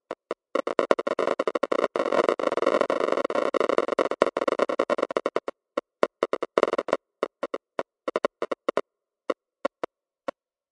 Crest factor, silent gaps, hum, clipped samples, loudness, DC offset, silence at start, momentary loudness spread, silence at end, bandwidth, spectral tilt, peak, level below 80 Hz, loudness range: 26 dB; none; none; under 0.1%; -27 LUFS; under 0.1%; 0.1 s; 11 LU; 1.05 s; 11 kHz; -4.5 dB/octave; -2 dBFS; -80 dBFS; 7 LU